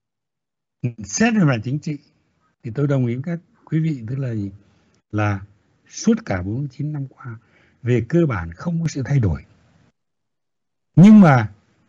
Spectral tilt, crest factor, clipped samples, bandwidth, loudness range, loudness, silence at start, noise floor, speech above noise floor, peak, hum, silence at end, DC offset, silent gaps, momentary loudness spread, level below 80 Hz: -7 dB/octave; 16 dB; under 0.1%; 7.8 kHz; 9 LU; -19 LUFS; 0.85 s; -86 dBFS; 68 dB; -4 dBFS; none; 0.4 s; under 0.1%; none; 18 LU; -48 dBFS